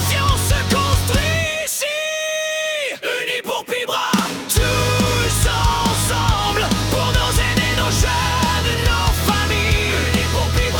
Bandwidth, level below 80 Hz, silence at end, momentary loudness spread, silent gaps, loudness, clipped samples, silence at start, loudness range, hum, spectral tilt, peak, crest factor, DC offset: 19 kHz; -26 dBFS; 0 s; 4 LU; none; -18 LUFS; under 0.1%; 0 s; 3 LU; none; -3.5 dB/octave; -2 dBFS; 16 dB; under 0.1%